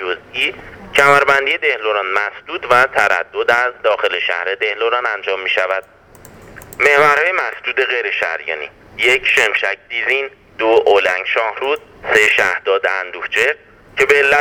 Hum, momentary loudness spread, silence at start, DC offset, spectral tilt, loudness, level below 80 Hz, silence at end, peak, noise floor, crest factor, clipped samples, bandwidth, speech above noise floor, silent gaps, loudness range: none; 11 LU; 0 s; under 0.1%; -2.5 dB/octave; -15 LUFS; -52 dBFS; 0 s; 0 dBFS; -41 dBFS; 16 dB; under 0.1%; 19.5 kHz; 26 dB; none; 2 LU